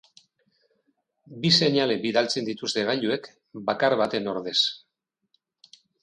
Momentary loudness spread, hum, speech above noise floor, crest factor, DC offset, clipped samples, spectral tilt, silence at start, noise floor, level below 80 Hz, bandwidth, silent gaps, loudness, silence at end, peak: 11 LU; none; 55 dB; 22 dB; under 0.1%; under 0.1%; -4 dB/octave; 1.3 s; -80 dBFS; -70 dBFS; 11 kHz; none; -24 LUFS; 1.25 s; -6 dBFS